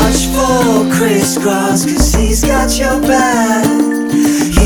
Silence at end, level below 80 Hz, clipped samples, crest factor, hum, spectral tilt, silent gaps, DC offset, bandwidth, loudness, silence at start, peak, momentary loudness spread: 0 s; -20 dBFS; under 0.1%; 10 dB; none; -4.5 dB/octave; none; under 0.1%; 19.5 kHz; -12 LUFS; 0 s; 0 dBFS; 2 LU